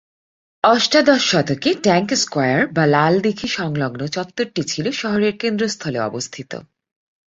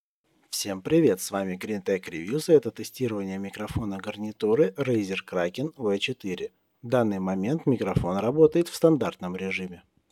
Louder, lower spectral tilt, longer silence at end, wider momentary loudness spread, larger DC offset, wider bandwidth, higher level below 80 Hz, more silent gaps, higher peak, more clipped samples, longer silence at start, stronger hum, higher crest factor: first, -18 LUFS vs -26 LUFS; second, -4.5 dB/octave vs -6 dB/octave; first, 0.65 s vs 0.35 s; about the same, 11 LU vs 12 LU; neither; second, 8 kHz vs 16 kHz; about the same, -58 dBFS vs -54 dBFS; neither; first, 0 dBFS vs -6 dBFS; neither; first, 0.65 s vs 0.5 s; neither; about the same, 18 dB vs 20 dB